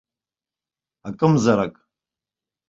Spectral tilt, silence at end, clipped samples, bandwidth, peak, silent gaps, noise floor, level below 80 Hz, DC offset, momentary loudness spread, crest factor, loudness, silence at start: -7 dB/octave; 1 s; under 0.1%; 7.8 kHz; -2 dBFS; none; under -90 dBFS; -58 dBFS; under 0.1%; 19 LU; 22 dB; -20 LUFS; 1.05 s